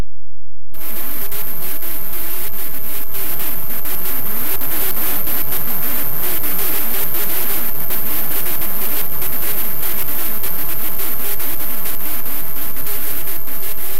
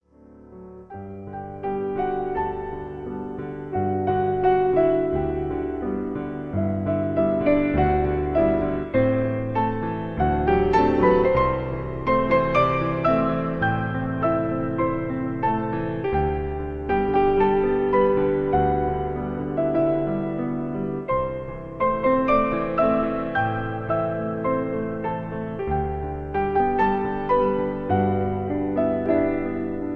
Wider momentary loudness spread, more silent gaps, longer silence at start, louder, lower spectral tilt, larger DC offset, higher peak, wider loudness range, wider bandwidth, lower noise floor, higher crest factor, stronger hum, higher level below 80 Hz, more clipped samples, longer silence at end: second, 5 LU vs 10 LU; neither; second, 0 s vs 0.3 s; about the same, -21 LUFS vs -23 LUFS; second, -3 dB/octave vs -9.5 dB/octave; first, 40% vs under 0.1%; about the same, -4 dBFS vs -6 dBFS; about the same, 4 LU vs 4 LU; first, 16 kHz vs 5.8 kHz; about the same, -49 dBFS vs -49 dBFS; about the same, 14 dB vs 16 dB; neither; about the same, -42 dBFS vs -38 dBFS; neither; about the same, 0 s vs 0 s